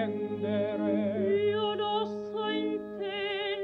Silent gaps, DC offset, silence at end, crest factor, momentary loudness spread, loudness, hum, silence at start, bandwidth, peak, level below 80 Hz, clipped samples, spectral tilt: none; under 0.1%; 0 s; 12 dB; 6 LU; -31 LUFS; none; 0 s; 6 kHz; -18 dBFS; -70 dBFS; under 0.1%; -7.5 dB/octave